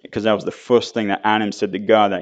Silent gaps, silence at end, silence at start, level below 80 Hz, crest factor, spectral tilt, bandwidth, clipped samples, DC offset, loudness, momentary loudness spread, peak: none; 0 s; 0.1 s; -62 dBFS; 18 dB; -5 dB/octave; 8.2 kHz; under 0.1%; under 0.1%; -19 LUFS; 7 LU; 0 dBFS